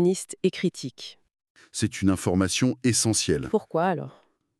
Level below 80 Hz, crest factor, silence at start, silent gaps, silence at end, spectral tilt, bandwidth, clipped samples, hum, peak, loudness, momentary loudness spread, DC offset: -54 dBFS; 18 dB; 0 s; 1.50-1.55 s; 0.5 s; -4.5 dB/octave; 13.5 kHz; under 0.1%; none; -8 dBFS; -25 LUFS; 14 LU; under 0.1%